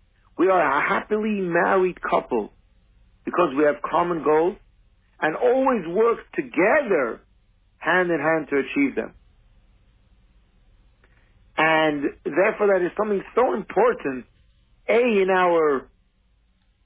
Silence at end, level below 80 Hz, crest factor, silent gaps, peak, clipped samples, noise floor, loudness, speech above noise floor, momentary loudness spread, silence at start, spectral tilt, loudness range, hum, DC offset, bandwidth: 1 s; -56 dBFS; 16 dB; none; -8 dBFS; under 0.1%; -63 dBFS; -22 LUFS; 42 dB; 10 LU; 0.4 s; -9.5 dB/octave; 4 LU; none; under 0.1%; 4 kHz